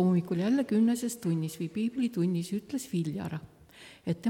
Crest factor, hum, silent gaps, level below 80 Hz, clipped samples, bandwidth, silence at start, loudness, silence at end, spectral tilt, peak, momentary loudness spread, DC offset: 12 dB; none; none; -68 dBFS; under 0.1%; 17 kHz; 0 s; -31 LUFS; 0 s; -7 dB/octave; -18 dBFS; 11 LU; under 0.1%